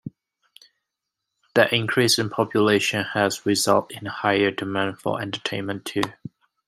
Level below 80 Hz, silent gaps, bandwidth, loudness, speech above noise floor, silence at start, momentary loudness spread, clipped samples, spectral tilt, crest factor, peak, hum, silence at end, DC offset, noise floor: -66 dBFS; none; 16 kHz; -22 LUFS; 60 dB; 0.05 s; 10 LU; under 0.1%; -4 dB/octave; 22 dB; -2 dBFS; none; 0.4 s; under 0.1%; -83 dBFS